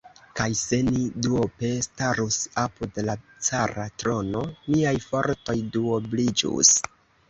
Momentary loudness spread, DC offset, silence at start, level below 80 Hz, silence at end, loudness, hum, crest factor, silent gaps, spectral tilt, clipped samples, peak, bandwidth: 10 LU; under 0.1%; 0.05 s; -50 dBFS; 0.4 s; -24 LUFS; none; 24 dB; none; -3.5 dB/octave; under 0.1%; -2 dBFS; 8.4 kHz